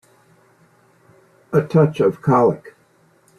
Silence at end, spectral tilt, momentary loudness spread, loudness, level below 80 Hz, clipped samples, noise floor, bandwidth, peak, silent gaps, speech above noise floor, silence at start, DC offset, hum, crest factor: 0.7 s; -9 dB/octave; 6 LU; -17 LUFS; -60 dBFS; under 0.1%; -57 dBFS; 11 kHz; -4 dBFS; none; 40 dB; 1.5 s; under 0.1%; none; 18 dB